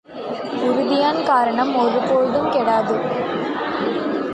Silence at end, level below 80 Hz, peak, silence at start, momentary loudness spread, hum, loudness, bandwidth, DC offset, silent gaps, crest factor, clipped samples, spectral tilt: 0 s; -60 dBFS; -4 dBFS; 0.1 s; 6 LU; none; -19 LUFS; 9.4 kHz; under 0.1%; none; 14 dB; under 0.1%; -6 dB/octave